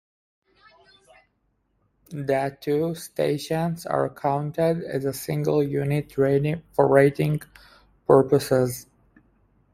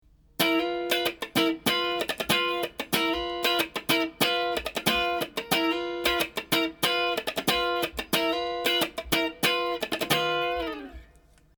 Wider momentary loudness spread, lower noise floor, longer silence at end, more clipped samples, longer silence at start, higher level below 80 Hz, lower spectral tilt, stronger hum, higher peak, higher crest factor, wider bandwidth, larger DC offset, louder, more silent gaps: first, 10 LU vs 5 LU; first, -70 dBFS vs -58 dBFS; first, 0.9 s vs 0.55 s; neither; first, 2.1 s vs 0.4 s; second, -58 dBFS vs -52 dBFS; first, -7 dB/octave vs -3 dB/octave; neither; first, -2 dBFS vs -8 dBFS; about the same, 22 dB vs 20 dB; second, 16 kHz vs over 20 kHz; neither; first, -23 LUFS vs -26 LUFS; neither